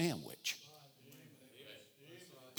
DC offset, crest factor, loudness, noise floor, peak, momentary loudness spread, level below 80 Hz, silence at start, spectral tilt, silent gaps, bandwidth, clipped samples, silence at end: under 0.1%; 24 dB; -44 LUFS; -61 dBFS; -22 dBFS; 18 LU; -88 dBFS; 0 s; -4 dB/octave; none; over 20 kHz; under 0.1%; 0 s